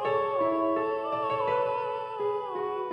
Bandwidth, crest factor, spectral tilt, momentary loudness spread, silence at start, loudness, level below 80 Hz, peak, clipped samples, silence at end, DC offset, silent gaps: 9 kHz; 14 dB; -7 dB/octave; 5 LU; 0 s; -29 LUFS; -68 dBFS; -16 dBFS; under 0.1%; 0 s; under 0.1%; none